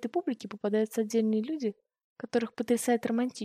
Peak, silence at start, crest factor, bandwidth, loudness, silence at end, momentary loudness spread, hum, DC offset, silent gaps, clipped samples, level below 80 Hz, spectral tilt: -14 dBFS; 0 s; 16 dB; 15.5 kHz; -30 LUFS; 0 s; 7 LU; none; under 0.1%; 2.04-2.16 s; under 0.1%; -80 dBFS; -5 dB/octave